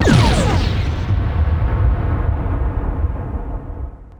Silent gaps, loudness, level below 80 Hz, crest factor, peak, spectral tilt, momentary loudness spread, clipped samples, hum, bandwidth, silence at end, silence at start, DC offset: none; -19 LUFS; -20 dBFS; 16 dB; 0 dBFS; -6.5 dB/octave; 13 LU; under 0.1%; none; 11 kHz; 0.05 s; 0 s; under 0.1%